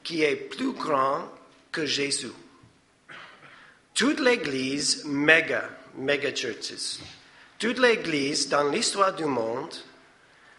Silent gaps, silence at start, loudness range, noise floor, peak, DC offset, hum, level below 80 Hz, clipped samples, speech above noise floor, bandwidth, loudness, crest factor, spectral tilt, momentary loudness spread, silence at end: none; 0.05 s; 5 LU; -58 dBFS; -2 dBFS; under 0.1%; none; -70 dBFS; under 0.1%; 33 dB; 11.5 kHz; -25 LUFS; 26 dB; -2.5 dB/octave; 16 LU; 0.7 s